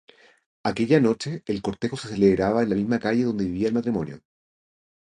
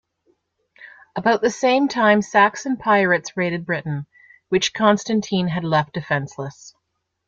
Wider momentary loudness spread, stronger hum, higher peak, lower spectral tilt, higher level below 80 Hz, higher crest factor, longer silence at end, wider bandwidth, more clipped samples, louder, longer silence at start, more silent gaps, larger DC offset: about the same, 9 LU vs 11 LU; neither; second, -6 dBFS vs -2 dBFS; first, -7 dB/octave vs -5 dB/octave; first, -52 dBFS vs -60 dBFS; about the same, 20 dB vs 18 dB; first, 0.85 s vs 0.6 s; first, 10 kHz vs 7.6 kHz; neither; second, -24 LUFS vs -19 LUFS; second, 0.65 s vs 0.8 s; neither; neither